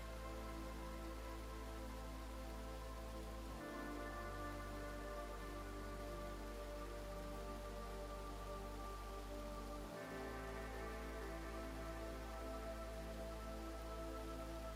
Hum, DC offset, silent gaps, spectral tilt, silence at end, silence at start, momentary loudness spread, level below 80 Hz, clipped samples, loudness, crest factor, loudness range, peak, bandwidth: none; under 0.1%; none; -5 dB/octave; 0 s; 0 s; 2 LU; -52 dBFS; under 0.1%; -50 LUFS; 12 dB; 1 LU; -36 dBFS; 16 kHz